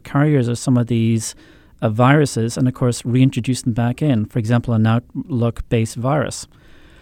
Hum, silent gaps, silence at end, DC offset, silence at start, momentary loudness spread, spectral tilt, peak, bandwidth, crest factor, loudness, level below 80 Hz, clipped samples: none; none; 0.55 s; under 0.1%; 0.05 s; 7 LU; -6.5 dB/octave; -2 dBFS; 14.5 kHz; 16 dB; -18 LUFS; -44 dBFS; under 0.1%